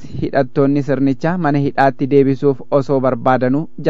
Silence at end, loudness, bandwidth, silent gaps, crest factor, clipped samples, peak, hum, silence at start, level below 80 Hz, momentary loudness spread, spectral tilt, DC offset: 0 s; -16 LUFS; 7.2 kHz; none; 14 dB; under 0.1%; 0 dBFS; none; 0 s; -48 dBFS; 4 LU; -9 dB/octave; 4%